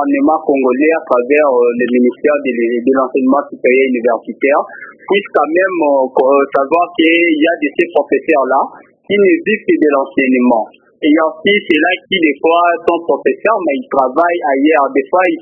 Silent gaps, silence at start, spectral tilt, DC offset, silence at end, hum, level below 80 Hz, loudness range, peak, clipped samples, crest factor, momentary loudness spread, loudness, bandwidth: none; 0 s; -7.5 dB/octave; under 0.1%; 0 s; none; -62 dBFS; 1 LU; 0 dBFS; under 0.1%; 12 dB; 4 LU; -12 LUFS; 4 kHz